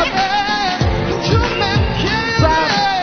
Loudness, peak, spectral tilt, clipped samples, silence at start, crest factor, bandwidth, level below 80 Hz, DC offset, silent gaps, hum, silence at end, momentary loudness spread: -15 LUFS; -2 dBFS; -5 dB/octave; under 0.1%; 0 s; 14 dB; 6.6 kHz; -26 dBFS; under 0.1%; none; none; 0 s; 3 LU